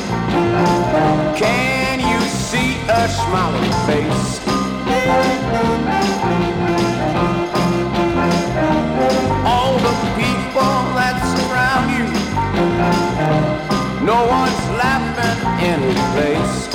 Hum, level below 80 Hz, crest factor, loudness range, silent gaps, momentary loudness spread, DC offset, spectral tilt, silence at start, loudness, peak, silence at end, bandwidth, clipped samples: none; -34 dBFS; 12 dB; 1 LU; none; 3 LU; under 0.1%; -5.5 dB/octave; 0 s; -17 LUFS; -4 dBFS; 0 s; 17 kHz; under 0.1%